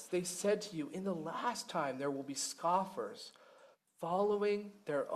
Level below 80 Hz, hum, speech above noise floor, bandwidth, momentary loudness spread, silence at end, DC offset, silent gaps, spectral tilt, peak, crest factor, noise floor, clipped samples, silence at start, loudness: -82 dBFS; none; 27 dB; 14.5 kHz; 9 LU; 0 s; under 0.1%; none; -4 dB/octave; -20 dBFS; 18 dB; -64 dBFS; under 0.1%; 0 s; -38 LUFS